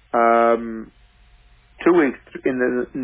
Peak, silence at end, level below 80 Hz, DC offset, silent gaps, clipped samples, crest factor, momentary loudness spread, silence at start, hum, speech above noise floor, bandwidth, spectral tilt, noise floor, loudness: -4 dBFS; 0 s; -54 dBFS; under 0.1%; none; under 0.1%; 16 dB; 11 LU; 0.15 s; none; 31 dB; 3.8 kHz; -10 dB/octave; -52 dBFS; -19 LUFS